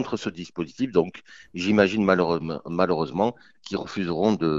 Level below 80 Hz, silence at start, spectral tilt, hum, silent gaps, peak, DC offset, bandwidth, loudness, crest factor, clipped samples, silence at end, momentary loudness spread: -56 dBFS; 0 s; -6.5 dB/octave; none; none; -4 dBFS; 0.1%; 7.8 kHz; -25 LUFS; 20 dB; under 0.1%; 0 s; 13 LU